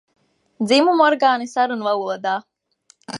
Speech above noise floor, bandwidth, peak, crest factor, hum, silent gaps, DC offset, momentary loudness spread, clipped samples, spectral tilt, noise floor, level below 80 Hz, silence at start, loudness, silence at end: 40 dB; 11.5 kHz; -2 dBFS; 18 dB; none; none; under 0.1%; 10 LU; under 0.1%; -4 dB/octave; -58 dBFS; -78 dBFS; 0.6 s; -18 LUFS; 0 s